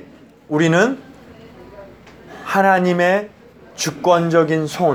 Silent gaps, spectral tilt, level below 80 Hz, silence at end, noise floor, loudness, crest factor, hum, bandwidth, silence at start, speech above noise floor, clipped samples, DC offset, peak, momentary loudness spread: none; -5.5 dB/octave; -56 dBFS; 0 s; -43 dBFS; -17 LUFS; 18 dB; none; 19 kHz; 0.5 s; 28 dB; under 0.1%; under 0.1%; 0 dBFS; 10 LU